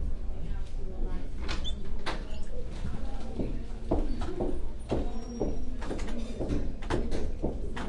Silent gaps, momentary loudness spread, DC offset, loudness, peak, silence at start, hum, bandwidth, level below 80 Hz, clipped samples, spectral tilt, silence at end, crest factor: none; 7 LU; under 0.1%; -37 LUFS; -14 dBFS; 0 s; none; 9.6 kHz; -34 dBFS; under 0.1%; -6.5 dB/octave; 0 s; 14 dB